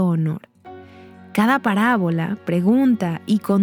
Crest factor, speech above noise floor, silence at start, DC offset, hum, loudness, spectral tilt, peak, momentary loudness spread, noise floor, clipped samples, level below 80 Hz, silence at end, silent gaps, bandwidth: 14 dB; 24 dB; 0 s; under 0.1%; none; -19 LUFS; -7.5 dB/octave; -4 dBFS; 8 LU; -43 dBFS; under 0.1%; -66 dBFS; 0 s; none; over 20 kHz